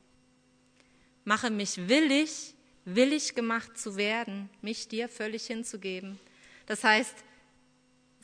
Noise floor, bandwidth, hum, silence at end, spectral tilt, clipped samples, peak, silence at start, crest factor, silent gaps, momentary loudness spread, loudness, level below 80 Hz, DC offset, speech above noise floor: -66 dBFS; 11 kHz; none; 1.05 s; -3 dB/octave; under 0.1%; -10 dBFS; 1.25 s; 22 dB; none; 16 LU; -30 LUFS; -76 dBFS; under 0.1%; 36 dB